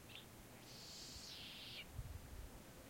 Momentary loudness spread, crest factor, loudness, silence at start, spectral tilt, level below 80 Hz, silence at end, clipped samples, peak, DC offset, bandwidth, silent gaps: 6 LU; 18 dB; -54 LUFS; 0 s; -3 dB/octave; -62 dBFS; 0 s; under 0.1%; -36 dBFS; under 0.1%; 16.5 kHz; none